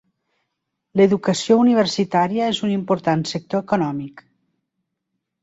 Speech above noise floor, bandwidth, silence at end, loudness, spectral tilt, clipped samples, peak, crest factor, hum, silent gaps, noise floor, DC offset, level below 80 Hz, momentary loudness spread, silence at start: 59 dB; 8 kHz; 1.2 s; -19 LUFS; -5.5 dB/octave; under 0.1%; -4 dBFS; 18 dB; none; none; -78 dBFS; under 0.1%; -62 dBFS; 10 LU; 0.95 s